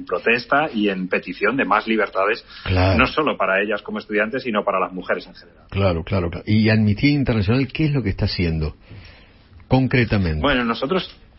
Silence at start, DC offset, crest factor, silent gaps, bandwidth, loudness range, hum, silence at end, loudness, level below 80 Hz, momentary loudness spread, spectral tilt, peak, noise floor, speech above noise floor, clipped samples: 0 s; under 0.1%; 20 dB; none; 5.8 kHz; 2 LU; none; 0.25 s; -20 LUFS; -38 dBFS; 7 LU; -10.5 dB/octave; -2 dBFS; -47 dBFS; 27 dB; under 0.1%